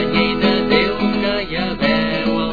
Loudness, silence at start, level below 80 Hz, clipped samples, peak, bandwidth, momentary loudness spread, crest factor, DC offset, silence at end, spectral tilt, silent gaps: -17 LUFS; 0 s; -38 dBFS; under 0.1%; -2 dBFS; 5 kHz; 4 LU; 16 dB; 2%; 0 s; -7 dB/octave; none